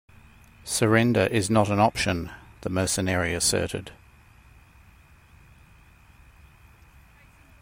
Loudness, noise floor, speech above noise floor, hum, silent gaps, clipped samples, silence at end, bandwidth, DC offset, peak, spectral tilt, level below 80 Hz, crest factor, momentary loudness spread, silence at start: -24 LUFS; -54 dBFS; 30 dB; none; none; under 0.1%; 3.7 s; 16 kHz; under 0.1%; -6 dBFS; -4.5 dB/octave; -52 dBFS; 22 dB; 16 LU; 0.65 s